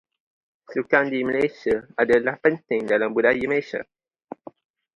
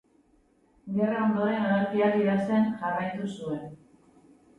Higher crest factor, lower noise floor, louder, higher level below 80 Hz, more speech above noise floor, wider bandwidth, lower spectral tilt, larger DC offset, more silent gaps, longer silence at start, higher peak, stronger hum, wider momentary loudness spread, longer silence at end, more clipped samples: first, 20 dB vs 14 dB; second, -43 dBFS vs -64 dBFS; first, -22 LUFS vs -27 LUFS; first, -60 dBFS vs -66 dBFS; second, 21 dB vs 38 dB; about the same, 8.2 kHz vs 8.6 kHz; second, -6.5 dB/octave vs -8 dB/octave; neither; neither; second, 0.7 s vs 0.85 s; first, -4 dBFS vs -14 dBFS; neither; first, 16 LU vs 11 LU; first, 1.15 s vs 0.85 s; neither